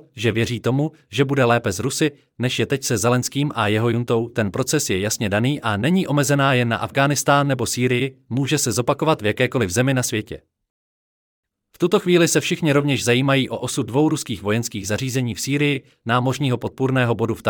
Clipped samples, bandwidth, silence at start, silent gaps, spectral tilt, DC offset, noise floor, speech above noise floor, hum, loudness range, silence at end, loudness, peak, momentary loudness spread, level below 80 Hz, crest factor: under 0.1%; 18.5 kHz; 0.15 s; 10.70-11.43 s; -5 dB/octave; under 0.1%; under -90 dBFS; over 70 dB; none; 3 LU; 0 s; -20 LUFS; -4 dBFS; 6 LU; -58 dBFS; 16 dB